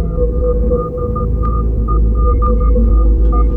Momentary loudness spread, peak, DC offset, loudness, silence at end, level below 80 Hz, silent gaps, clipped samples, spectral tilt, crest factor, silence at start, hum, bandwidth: 4 LU; -4 dBFS; under 0.1%; -15 LUFS; 0 s; -12 dBFS; none; under 0.1%; -13 dB/octave; 8 dB; 0 s; none; 1.5 kHz